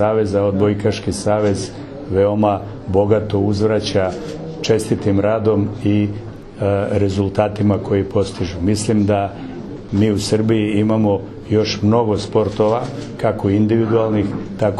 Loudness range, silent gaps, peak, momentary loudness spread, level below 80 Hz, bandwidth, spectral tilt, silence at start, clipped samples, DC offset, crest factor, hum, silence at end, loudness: 1 LU; none; 0 dBFS; 7 LU; -42 dBFS; 12 kHz; -7 dB/octave; 0 s; under 0.1%; under 0.1%; 16 dB; none; 0 s; -18 LUFS